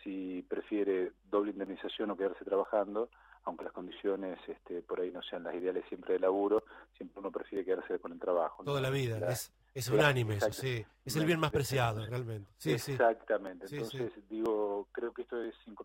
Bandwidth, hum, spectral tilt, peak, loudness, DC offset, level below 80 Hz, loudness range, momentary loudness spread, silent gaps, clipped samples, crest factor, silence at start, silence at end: 16.5 kHz; none; -5.5 dB/octave; -12 dBFS; -35 LUFS; under 0.1%; -64 dBFS; 5 LU; 12 LU; none; under 0.1%; 22 dB; 0 s; 0 s